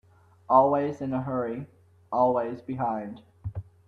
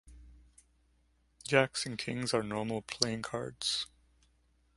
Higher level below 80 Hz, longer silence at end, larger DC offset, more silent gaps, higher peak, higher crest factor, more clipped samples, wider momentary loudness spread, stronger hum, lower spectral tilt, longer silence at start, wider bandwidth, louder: about the same, -58 dBFS vs -62 dBFS; second, 0.25 s vs 0.9 s; neither; neither; about the same, -6 dBFS vs -8 dBFS; second, 22 dB vs 28 dB; neither; first, 18 LU vs 9 LU; neither; first, -9.5 dB/octave vs -3.5 dB/octave; first, 0.5 s vs 0.05 s; second, 6.8 kHz vs 11.5 kHz; first, -26 LUFS vs -33 LUFS